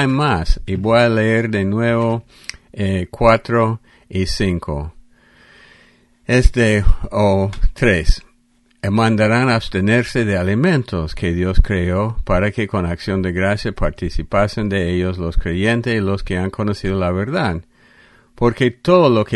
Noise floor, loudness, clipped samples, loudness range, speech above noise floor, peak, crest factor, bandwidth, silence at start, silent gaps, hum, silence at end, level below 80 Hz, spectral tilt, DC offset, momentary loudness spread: -57 dBFS; -18 LUFS; under 0.1%; 3 LU; 41 dB; 0 dBFS; 16 dB; 11.5 kHz; 0 s; none; none; 0 s; -24 dBFS; -6.5 dB/octave; under 0.1%; 9 LU